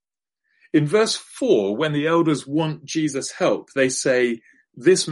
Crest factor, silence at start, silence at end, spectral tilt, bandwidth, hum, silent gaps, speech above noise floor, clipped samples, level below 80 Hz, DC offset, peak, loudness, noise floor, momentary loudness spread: 16 dB; 0.75 s; 0 s; -4.5 dB/octave; 11.5 kHz; none; none; 59 dB; under 0.1%; -68 dBFS; under 0.1%; -4 dBFS; -21 LUFS; -79 dBFS; 6 LU